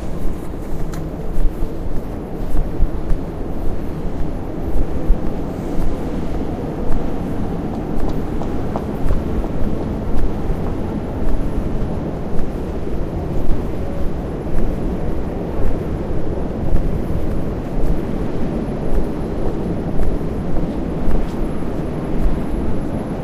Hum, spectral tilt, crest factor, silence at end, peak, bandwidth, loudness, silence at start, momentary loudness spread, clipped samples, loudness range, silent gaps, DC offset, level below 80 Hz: none; -8.5 dB/octave; 16 dB; 0 s; 0 dBFS; 4.6 kHz; -24 LUFS; 0 s; 4 LU; under 0.1%; 2 LU; none; under 0.1%; -22 dBFS